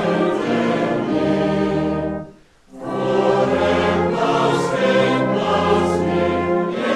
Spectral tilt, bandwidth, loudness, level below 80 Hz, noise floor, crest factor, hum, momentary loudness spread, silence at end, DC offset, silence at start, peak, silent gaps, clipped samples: -6.5 dB/octave; 12 kHz; -18 LUFS; -46 dBFS; -44 dBFS; 14 dB; none; 5 LU; 0 s; under 0.1%; 0 s; -4 dBFS; none; under 0.1%